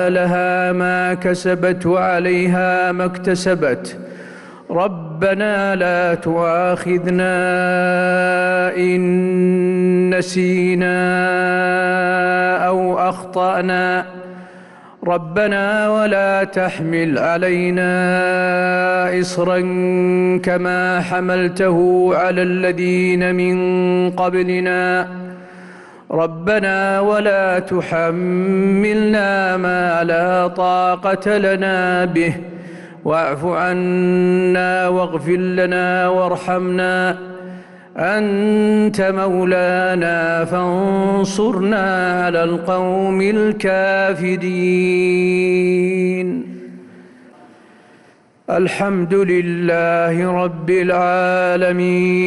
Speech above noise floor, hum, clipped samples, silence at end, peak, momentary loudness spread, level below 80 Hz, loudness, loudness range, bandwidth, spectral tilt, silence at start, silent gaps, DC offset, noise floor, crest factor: 34 dB; none; under 0.1%; 0 s; -6 dBFS; 5 LU; -54 dBFS; -16 LUFS; 3 LU; 11.5 kHz; -6.5 dB/octave; 0 s; none; under 0.1%; -50 dBFS; 10 dB